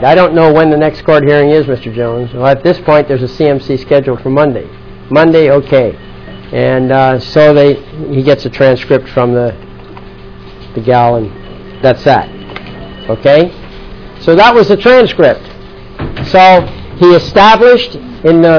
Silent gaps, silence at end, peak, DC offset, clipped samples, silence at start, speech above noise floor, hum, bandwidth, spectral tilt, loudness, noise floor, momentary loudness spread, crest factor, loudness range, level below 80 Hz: none; 0 s; 0 dBFS; 0.7%; 4%; 0 s; 22 dB; none; 5.4 kHz; -7.5 dB/octave; -8 LUFS; -30 dBFS; 17 LU; 8 dB; 6 LU; -34 dBFS